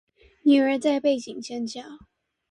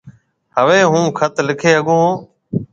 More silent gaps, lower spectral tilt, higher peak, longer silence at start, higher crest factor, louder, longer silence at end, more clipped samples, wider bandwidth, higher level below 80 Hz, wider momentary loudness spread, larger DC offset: neither; about the same, -4 dB/octave vs -5 dB/octave; second, -8 dBFS vs 0 dBFS; first, 0.45 s vs 0.05 s; about the same, 16 dB vs 16 dB; second, -24 LUFS vs -14 LUFS; first, 0.55 s vs 0.1 s; neither; first, 10.5 kHz vs 7.8 kHz; second, -66 dBFS vs -56 dBFS; about the same, 14 LU vs 13 LU; neither